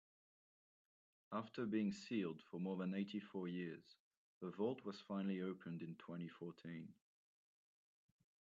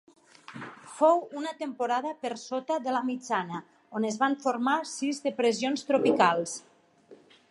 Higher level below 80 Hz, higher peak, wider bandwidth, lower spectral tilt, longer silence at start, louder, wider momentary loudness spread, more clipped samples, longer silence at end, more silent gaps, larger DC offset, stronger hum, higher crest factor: second, -90 dBFS vs -78 dBFS; second, -30 dBFS vs -8 dBFS; second, 7.6 kHz vs 11.5 kHz; first, -6.5 dB/octave vs -4 dB/octave; first, 1.3 s vs 0.5 s; second, -47 LUFS vs -28 LUFS; second, 11 LU vs 16 LU; neither; first, 1.45 s vs 0.35 s; first, 3.99-4.11 s, 4.17-4.41 s vs none; neither; neither; about the same, 18 dB vs 22 dB